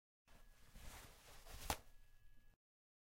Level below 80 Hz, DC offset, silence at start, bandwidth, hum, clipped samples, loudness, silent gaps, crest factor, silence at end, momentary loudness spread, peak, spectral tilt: -62 dBFS; under 0.1%; 0.25 s; 16.5 kHz; none; under 0.1%; -53 LUFS; none; 34 dB; 0.55 s; 18 LU; -22 dBFS; -2.5 dB/octave